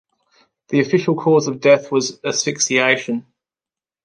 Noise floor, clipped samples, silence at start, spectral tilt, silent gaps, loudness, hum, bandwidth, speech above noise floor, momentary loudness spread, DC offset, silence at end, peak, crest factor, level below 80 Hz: under -90 dBFS; under 0.1%; 0.7 s; -4 dB/octave; none; -17 LUFS; none; 10.5 kHz; over 73 dB; 7 LU; under 0.1%; 0.85 s; -2 dBFS; 16 dB; -68 dBFS